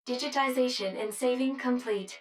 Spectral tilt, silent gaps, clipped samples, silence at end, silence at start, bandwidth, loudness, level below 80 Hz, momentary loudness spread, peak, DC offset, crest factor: -3 dB/octave; none; under 0.1%; 0 s; 0.05 s; 15 kHz; -30 LUFS; -86 dBFS; 5 LU; -14 dBFS; under 0.1%; 16 dB